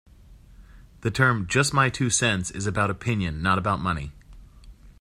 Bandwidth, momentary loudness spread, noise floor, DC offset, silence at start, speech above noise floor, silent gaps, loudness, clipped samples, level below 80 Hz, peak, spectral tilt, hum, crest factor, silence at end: 14.5 kHz; 8 LU; -49 dBFS; under 0.1%; 0.3 s; 26 dB; none; -24 LUFS; under 0.1%; -46 dBFS; -6 dBFS; -4 dB/octave; none; 20 dB; 0.1 s